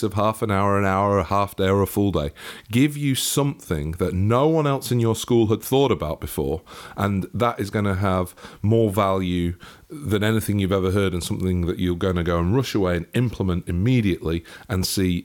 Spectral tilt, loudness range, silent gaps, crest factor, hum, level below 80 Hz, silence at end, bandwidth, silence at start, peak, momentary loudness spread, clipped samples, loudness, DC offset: -6 dB/octave; 2 LU; none; 14 dB; none; -42 dBFS; 0 s; 18 kHz; 0 s; -8 dBFS; 8 LU; under 0.1%; -22 LUFS; under 0.1%